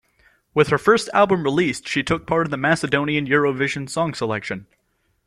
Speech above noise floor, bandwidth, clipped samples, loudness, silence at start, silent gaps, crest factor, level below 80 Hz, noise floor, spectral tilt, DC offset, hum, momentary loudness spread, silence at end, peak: 39 dB; 13 kHz; under 0.1%; -20 LUFS; 0.55 s; none; 18 dB; -52 dBFS; -59 dBFS; -5 dB/octave; under 0.1%; none; 8 LU; 0.65 s; -2 dBFS